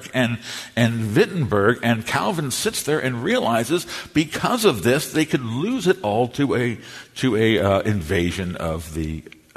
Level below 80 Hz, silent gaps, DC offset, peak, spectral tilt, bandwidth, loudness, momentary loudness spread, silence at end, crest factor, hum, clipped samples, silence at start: -46 dBFS; none; under 0.1%; -2 dBFS; -5 dB/octave; 13.5 kHz; -21 LUFS; 9 LU; 0.35 s; 18 dB; none; under 0.1%; 0 s